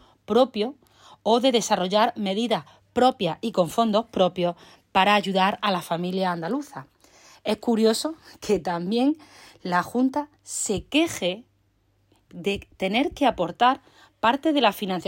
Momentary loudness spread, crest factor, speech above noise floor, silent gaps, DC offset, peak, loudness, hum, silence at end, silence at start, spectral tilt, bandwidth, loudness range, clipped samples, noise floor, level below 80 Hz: 10 LU; 18 dB; 42 dB; none; under 0.1%; -6 dBFS; -24 LUFS; none; 0.05 s; 0.3 s; -4.5 dB/octave; 16.5 kHz; 4 LU; under 0.1%; -66 dBFS; -58 dBFS